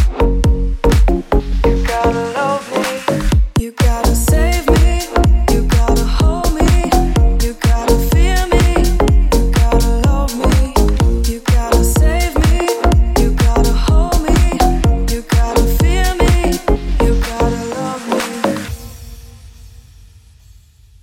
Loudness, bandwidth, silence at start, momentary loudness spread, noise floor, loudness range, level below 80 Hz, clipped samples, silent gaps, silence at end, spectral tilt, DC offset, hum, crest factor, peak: -15 LUFS; 16.5 kHz; 0 s; 5 LU; -44 dBFS; 4 LU; -14 dBFS; under 0.1%; none; 1.35 s; -5.5 dB/octave; under 0.1%; none; 12 dB; 0 dBFS